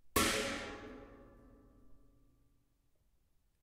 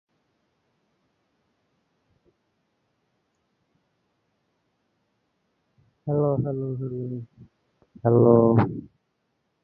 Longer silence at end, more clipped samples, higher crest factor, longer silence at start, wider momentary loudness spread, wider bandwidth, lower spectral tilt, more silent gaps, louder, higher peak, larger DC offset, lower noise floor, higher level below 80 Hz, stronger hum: first, 1.65 s vs 0.8 s; neither; about the same, 26 dB vs 24 dB; second, 0.05 s vs 6.05 s; first, 23 LU vs 19 LU; first, 16 kHz vs 4.4 kHz; second, -2.5 dB/octave vs -13 dB/octave; neither; second, -36 LUFS vs -22 LUFS; second, -16 dBFS vs -4 dBFS; neither; about the same, -74 dBFS vs -75 dBFS; about the same, -58 dBFS vs -58 dBFS; neither